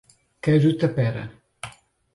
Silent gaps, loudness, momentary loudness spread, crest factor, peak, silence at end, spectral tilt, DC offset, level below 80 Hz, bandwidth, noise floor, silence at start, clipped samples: none; -22 LUFS; 20 LU; 16 dB; -8 dBFS; 0.45 s; -8 dB/octave; under 0.1%; -56 dBFS; 11.5 kHz; -44 dBFS; 0.45 s; under 0.1%